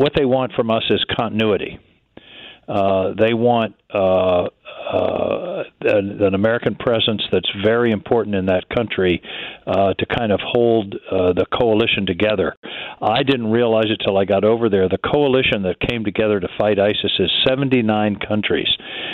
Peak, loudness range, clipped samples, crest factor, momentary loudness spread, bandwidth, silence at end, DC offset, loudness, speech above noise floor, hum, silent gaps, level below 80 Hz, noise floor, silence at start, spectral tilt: -4 dBFS; 2 LU; under 0.1%; 14 dB; 7 LU; 5.2 kHz; 0 s; under 0.1%; -18 LUFS; 27 dB; none; 12.57-12.63 s; -46 dBFS; -44 dBFS; 0 s; -8 dB/octave